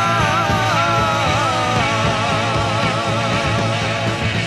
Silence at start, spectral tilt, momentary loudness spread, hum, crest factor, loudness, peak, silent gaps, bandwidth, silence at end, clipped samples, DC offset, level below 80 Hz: 0 s; -4.5 dB/octave; 3 LU; none; 14 dB; -17 LUFS; -4 dBFS; none; 12.5 kHz; 0 s; under 0.1%; under 0.1%; -36 dBFS